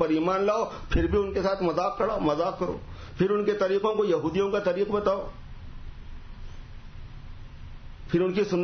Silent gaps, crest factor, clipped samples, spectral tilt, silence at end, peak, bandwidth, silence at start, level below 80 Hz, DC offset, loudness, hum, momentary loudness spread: none; 18 dB; under 0.1%; -7 dB/octave; 0 s; -10 dBFS; 6.6 kHz; 0 s; -40 dBFS; under 0.1%; -26 LUFS; none; 22 LU